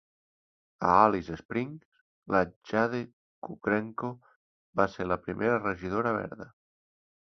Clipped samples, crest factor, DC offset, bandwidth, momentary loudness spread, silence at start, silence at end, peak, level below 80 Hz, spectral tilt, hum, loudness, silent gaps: under 0.1%; 24 dB; under 0.1%; 6.4 kHz; 20 LU; 0.8 s; 0.75 s; -8 dBFS; -58 dBFS; -7.5 dB/octave; none; -29 LUFS; 1.45-1.49 s, 1.85-1.92 s, 2.01-2.22 s, 2.56-2.61 s, 3.13-3.42 s, 4.36-4.73 s